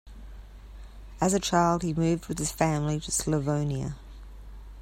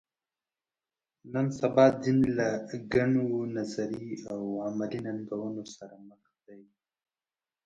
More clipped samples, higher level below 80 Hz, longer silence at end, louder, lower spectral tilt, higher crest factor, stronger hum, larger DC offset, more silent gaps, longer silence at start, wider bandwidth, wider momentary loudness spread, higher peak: neither; first, -44 dBFS vs -62 dBFS; second, 0 s vs 1.05 s; about the same, -27 LUFS vs -29 LUFS; second, -5 dB/octave vs -7 dB/octave; second, 18 dB vs 24 dB; neither; neither; neither; second, 0.05 s vs 1.25 s; first, 16 kHz vs 7.8 kHz; first, 24 LU vs 15 LU; about the same, -10 dBFS vs -8 dBFS